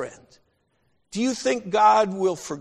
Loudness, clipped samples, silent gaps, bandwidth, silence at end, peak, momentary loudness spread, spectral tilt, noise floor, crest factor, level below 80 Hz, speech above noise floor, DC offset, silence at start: -21 LUFS; under 0.1%; none; 13 kHz; 0 s; -6 dBFS; 13 LU; -4 dB/octave; -69 dBFS; 18 dB; -66 dBFS; 47 dB; under 0.1%; 0 s